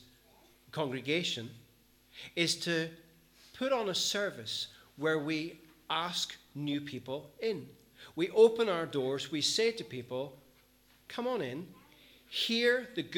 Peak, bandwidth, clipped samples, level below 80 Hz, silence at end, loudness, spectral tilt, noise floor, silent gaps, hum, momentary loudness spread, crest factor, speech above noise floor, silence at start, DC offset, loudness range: -12 dBFS; 18.5 kHz; under 0.1%; -74 dBFS; 0 s; -33 LUFS; -3.5 dB/octave; -65 dBFS; none; none; 14 LU; 22 dB; 32 dB; 0.75 s; under 0.1%; 5 LU